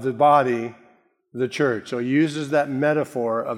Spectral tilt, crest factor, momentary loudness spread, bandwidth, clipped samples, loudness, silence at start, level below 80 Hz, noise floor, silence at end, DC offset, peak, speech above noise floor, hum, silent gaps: -6.5 dB/octave; 16 dB; 11 LU; 15.5 kHz; under 0.1%; -21 LUFS; 0 s; -74 dBFS; -58 dBFS; 0 s; under 0.1%; -4 dBFS; 37 dB; none; none